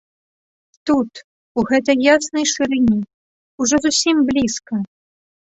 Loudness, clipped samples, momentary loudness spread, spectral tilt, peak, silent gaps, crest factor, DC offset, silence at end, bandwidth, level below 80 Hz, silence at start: -17 LUFS; under 0.1%; 12 LU; -3 dB/octave; -2 dBFS; 1.24-1.55 s, 3.14-3.58 s; 18 dB; under 0.1%; 0.7 s; 8.4 kHz; -50 dBFS; 0.85 s